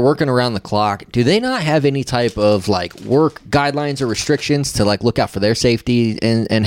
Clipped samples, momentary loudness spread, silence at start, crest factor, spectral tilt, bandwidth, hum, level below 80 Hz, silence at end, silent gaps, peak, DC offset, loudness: under 0.1%; 4 LU; 0 s; 12 dB; -5.5 dB/octave; 17 kHz; none; -42 dBFS; 0 s; none; -4 dBFS; under 0.1%; -17 LUFS